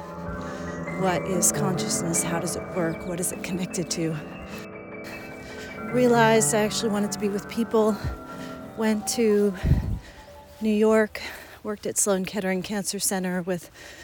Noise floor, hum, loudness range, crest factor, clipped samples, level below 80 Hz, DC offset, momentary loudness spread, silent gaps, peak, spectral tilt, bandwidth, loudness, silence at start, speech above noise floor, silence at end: -46 dBFS; none; 5 LU; 18 dB; under 0.1%; -42 dBFS; under 0.1%; 16 LU; none; -8 dBFS; -4.5 dB/octave; over 20 kHz; -25 LUFS; 0 s; 21 dB; 0 s